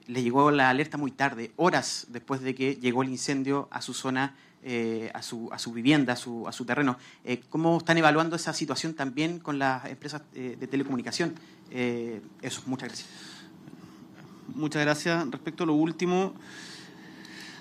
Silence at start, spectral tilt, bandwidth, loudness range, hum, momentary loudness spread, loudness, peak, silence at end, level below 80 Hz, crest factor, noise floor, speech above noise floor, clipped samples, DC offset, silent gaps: 0.1 s; -5 dB/octave; 14 kHz; 7 LU; none; 20 LU; -28 LUFS; -6 dBFS; 0 s; -74 dBFS; 22 dB; -49 dBFS; 21 dB; under 0.1%; under 0.1%; none